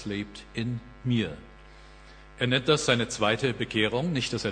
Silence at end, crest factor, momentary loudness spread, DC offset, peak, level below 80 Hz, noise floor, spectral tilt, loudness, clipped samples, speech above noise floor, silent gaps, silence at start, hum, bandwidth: 0 s; 22 dB; 11 LU; under 0.1%; -6 dBFS; -52 dBFS; -49 dBFS; -4.5 dB/octave; -27 LUFS; under 0.1%; 22 dB; none; 0 s; none; 10 kHz